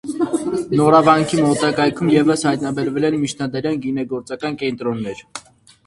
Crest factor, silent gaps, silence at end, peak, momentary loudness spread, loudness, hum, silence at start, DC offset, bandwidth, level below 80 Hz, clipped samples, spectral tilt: 18 dB; none; 0.45 s; 0 dBFS; 13 LU; -18 LUFS; none; 0.05 s; under 0.1%; 11.5 kHz; -54 dBFS; under 0.1%; -5.5 dB/octave